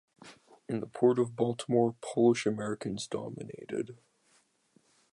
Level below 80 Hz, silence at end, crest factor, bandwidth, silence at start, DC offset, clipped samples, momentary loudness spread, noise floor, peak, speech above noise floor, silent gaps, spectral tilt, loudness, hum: -72 dBFS; 1.2 s; 20 dB; 11 kHz; 0.25 s; under 0.1%; under 0.1%; 12 LU; -69 dBFS; -12 dBFS; 39 dB; none; -6 dB/octave; -31 LUFS; none